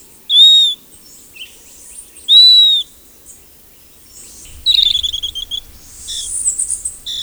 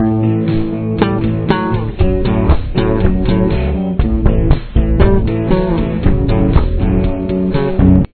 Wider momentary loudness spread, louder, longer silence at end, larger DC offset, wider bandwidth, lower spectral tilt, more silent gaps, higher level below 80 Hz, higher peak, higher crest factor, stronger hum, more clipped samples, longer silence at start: first, 21 LU vs 4 LU; first, -9 LUFS vs -14 LUFS; about the same, 0 s vs 0.1 s; neither; first, over 20 kHz vs 4.5 kHz; second, 2.5 dB/octave vs -12 dB/octave; neither; second, -44 dBFS vs -18 dBFS; about the same, 0 dBFS vs 0 dBFS; about the same, 16 dB vs 12 dB; neither; second, under 0.1% vs 0.1%; first, 0.3 s vs 0 s